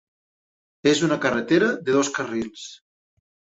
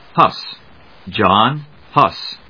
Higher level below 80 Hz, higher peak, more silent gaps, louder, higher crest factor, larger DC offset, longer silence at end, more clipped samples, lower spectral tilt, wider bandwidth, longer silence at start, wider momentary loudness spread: second, -62 dBFS vs -52 dBFS; second, -6 dBFS vs 0 dBFS; neither; second, -22 LUFS vs -15 LUFS; about the same, 18 dB vs 18 dB; second, under 0.1% vs 0.3%; first, 0.85 s vs 0.15 s; second, under 0.1% vs 0.1%; second, -4.5 dB/octave vs -6.5 dB/octave; first, 8.2 kHz vs 5.4 kHz; first, 0.85 s vs 0.15 s; second, 13 LU vs 16 LU